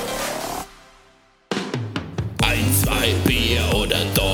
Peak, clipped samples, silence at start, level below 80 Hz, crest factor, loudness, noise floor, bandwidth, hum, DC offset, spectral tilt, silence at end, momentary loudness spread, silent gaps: 0 dBFS; under 0.1%; 0 s; -32 dBFS; 20 dB; -21 LUFS; -55 dBFS; 19 kHz; none; under 0.1%; -4 dB/octave; 0 s; 11 LU; none